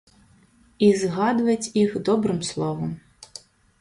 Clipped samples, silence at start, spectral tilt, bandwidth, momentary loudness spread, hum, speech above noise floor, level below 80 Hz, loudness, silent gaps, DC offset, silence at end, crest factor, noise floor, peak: under 0.1%; 0.8 s; -5.5 dB/octave; 11.5 kHz; 22 LU; none; 35 dB; -58 dBFS; -23 LUFS; none; under 0.1%; 0.55 s; 18 dB; -57 dBFS; -4 dBFS